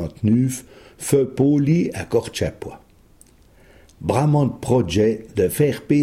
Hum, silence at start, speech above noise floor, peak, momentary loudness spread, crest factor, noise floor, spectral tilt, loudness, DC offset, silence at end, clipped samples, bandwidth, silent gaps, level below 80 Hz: none; 0 s; 32 dB; -4 dBFS; 11 LU; 18 dB; -51 dBFS; -6.5 dB/octave; -20 LUFS; under 0.1%; 0 s; under 0.1%; 15.5 kHz; none; -46 dBFS